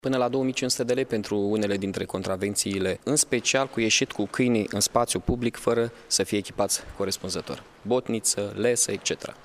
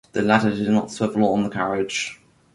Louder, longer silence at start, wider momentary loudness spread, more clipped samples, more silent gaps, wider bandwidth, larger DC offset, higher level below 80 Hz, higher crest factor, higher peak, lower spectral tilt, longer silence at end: second, -25 LUFS vs -21 LUFS; about the same, 0.05 s vs 0.15 s; about the same, 7 LU vs 7 LU; neither; neither; first, 15.5 kHz vs 11.5 kHz; neither; first, -50 dBFS vs -56 dBFS; about the same, 20 dB vs 18 dB; about the same, -6 dBFS vs -4 dBFS; second, -3 dB/octave vs -5.5 dB/octave; second, 0.1 s vs 0.4 s